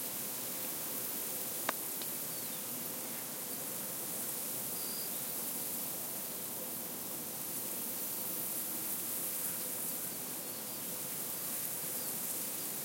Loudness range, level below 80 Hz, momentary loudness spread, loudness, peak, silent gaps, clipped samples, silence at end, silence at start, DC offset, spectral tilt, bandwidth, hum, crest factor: 1 LU; -80 dBFS; 3 LU; -36 LUFS; -14 dBFS; none; under 0.1%; 0 s; 0 s; under 0.1%; -1.5 dB/octave; 16.5 kHz; none; 24 dB